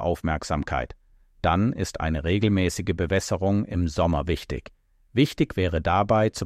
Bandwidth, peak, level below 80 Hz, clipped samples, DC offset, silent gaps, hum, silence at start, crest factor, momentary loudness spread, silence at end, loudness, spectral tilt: 15 kHz; -8 dBFS; -38 dBFS; under 0.1%; under 0.1%; none; none; 0 s; 16 dB; 7 LU; 0 s; -25 LUFS; -6 dB/octave